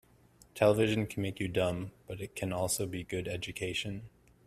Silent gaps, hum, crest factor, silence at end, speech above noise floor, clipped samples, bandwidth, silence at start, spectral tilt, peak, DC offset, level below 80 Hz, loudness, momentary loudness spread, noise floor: none; none; 22 dB; 0.4 s; 29 dB; under 0.1%; 15 kHz; 0.55 s; -5 dB/octave; -12 dBFS; under 0.1%; -60 dBFS; -33 LUFS; 14 LU; -62 dBFS